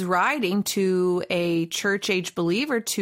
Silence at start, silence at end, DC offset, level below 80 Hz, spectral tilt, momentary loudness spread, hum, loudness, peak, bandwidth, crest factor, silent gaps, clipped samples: 0 s; 0 s; under 0.1%; -66 dBFS; -4 dB/octave; 3 LU; none; -24 LUFS; -10 dBFS; 16.5 kHz; 14 dB; none; under 0.1%